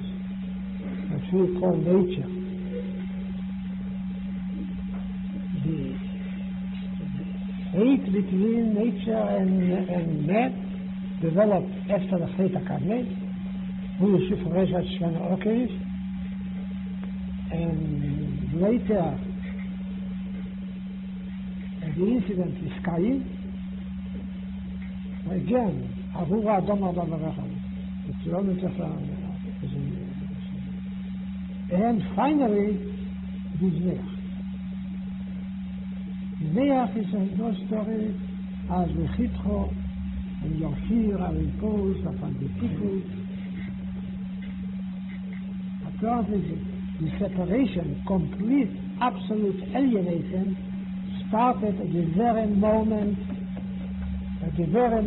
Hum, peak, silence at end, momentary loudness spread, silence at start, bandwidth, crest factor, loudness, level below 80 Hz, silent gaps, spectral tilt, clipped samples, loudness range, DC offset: none; -10 dBFS; 0 s; 11 LU; 0 s; 4.1 kHz; 16 dB; -28 LUFS; -42 dBFS; none; -12.5 dB/octave; under 0.1%; 6 LU; under 0.1%